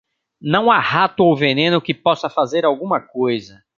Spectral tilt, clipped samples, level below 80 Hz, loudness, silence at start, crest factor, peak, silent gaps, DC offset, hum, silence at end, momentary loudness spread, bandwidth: -6.5 dB/octave; under 0.1%; -60 dBFS; -17 LUFS; 0.45 s; 16 dB; -2 dBFS; none; under 0.1%; none; 0.3 s; 7 LU; 7.4 kHz